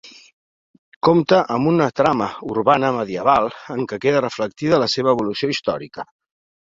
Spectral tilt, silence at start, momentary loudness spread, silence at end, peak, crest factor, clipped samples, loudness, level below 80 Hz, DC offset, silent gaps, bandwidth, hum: -6 dB/octave; 0.05 s; 9 LU; 0.65 s; -2 dBFS; 18 dB; under 0.1%; -19 LUFS; -56 dBFS; under 0.1%; 0.33-1.01 s; 7.8 kHz; none